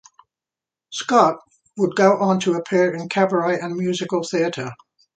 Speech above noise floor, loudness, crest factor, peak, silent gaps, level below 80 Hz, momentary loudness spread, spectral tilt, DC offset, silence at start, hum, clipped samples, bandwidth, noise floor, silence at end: 70 dB; -20 LUFS; 20 dB; 0 dBFS; none; -68 dBFS; 14 LU; -5.5 dB/octave; under 0.1%; 0.9 s; none; under 0.1%; 9.2 kHz; -89 dBFS; 0.45 s